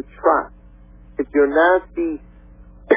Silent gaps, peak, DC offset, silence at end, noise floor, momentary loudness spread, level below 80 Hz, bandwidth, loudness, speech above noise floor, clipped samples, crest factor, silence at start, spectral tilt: none; -2 dBFS; under 0.1%; 0 s; -44 dBFS; 19 LU; -44 dBFS; 3.8 kHz; -18 LUFS; 26 dB; under 0.1%; 18 dB; 0.2 s; -9 dB/octave